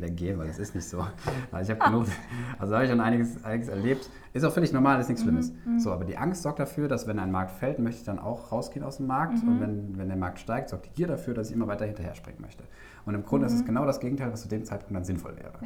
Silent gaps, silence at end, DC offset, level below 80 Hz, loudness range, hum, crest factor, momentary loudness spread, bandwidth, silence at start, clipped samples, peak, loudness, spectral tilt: none; 0 s; under 0.1%; -50 dBFS; 5 LU; none; 20 dB; 11 LU; 16.5 kHz; 0 s; under 0.1%; -8 dBFS; -29 LUFS; -7 dB/octave